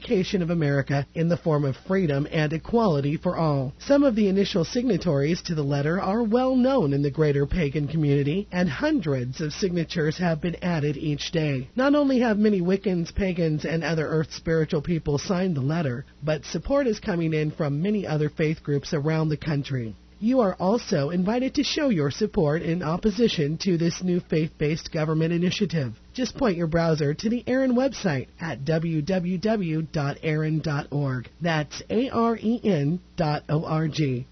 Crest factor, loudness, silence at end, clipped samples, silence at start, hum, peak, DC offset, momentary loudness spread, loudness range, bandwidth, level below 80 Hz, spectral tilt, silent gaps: 16 dB; -25 LUFS; 0.05 s; under 0.1%; 0 s; none; -8 dBFS; under 0.1%; 6 LU; 3 LU; 6.4 kHz; -46 dBFS; -7 dB/octave; none